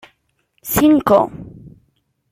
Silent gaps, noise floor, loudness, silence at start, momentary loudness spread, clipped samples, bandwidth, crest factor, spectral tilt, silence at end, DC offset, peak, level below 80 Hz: none; -65 dBFS; -15 LUFS; 0.65 s; 21 LU; under 0.1%; 16.5 kHz; 18 dB; -5.5 dB/octave; 0.8 s; under 0.1%; -2 dBFS; -44 dBFS